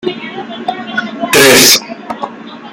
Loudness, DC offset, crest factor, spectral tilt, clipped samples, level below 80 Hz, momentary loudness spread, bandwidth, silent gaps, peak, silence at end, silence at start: -7 LUFS; under 0.1%; 12 dB; -1.5 dB/octave; 0.5%; -48 dBFS; 21 LU; over 20 kHz; none; 0 dBFS; 0 s; 0.05 s